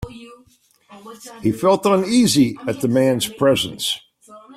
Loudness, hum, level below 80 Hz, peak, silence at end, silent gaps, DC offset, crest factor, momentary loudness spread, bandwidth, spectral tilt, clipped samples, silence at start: -18 LUFS; none; -50 dBFS; -4 dBFS; 0.05 s; none; under 0.1%; 16 dB; 12 LU; 15.5 kHz; -4.5 dB/octave; under 0.1%; 0 s